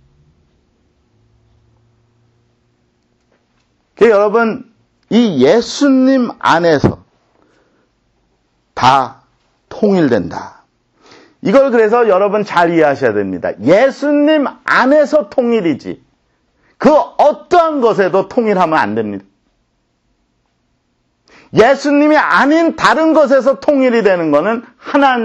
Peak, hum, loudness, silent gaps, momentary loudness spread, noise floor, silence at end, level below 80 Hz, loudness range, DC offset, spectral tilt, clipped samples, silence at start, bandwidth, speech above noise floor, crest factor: 0 dBFS; none; -12 LUFS; none; 10 LU; -62 dBFS; 0 s; -50 dBFS; 6 LU; under 0.1%; -6 dB/octave; under 0.1%; 4 s; 9 kHz; 51 dB; 14 dB